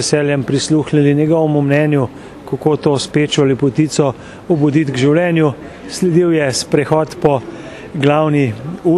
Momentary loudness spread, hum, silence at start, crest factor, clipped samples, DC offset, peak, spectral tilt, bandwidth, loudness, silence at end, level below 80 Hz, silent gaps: 9 LU; none; 0 s; 14 dB; under 0.1%; under 0.1%; 0 dBFS; -6 dB/octave; 12.5 kHz; -14 LUFS; 0 s; -48 dBFS; none